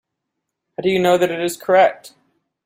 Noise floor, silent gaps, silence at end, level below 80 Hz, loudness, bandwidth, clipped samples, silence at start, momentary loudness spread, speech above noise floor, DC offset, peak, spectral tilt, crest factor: -78 dBFS; none; 0.6 s; -62 dBFS; -17 LUFS; 16 kHz; under 0.1%; 0.8 s; 9 LU; 62 dB; under 0.1%; -2 dBFS; -4.5 dB/octave; 16 dB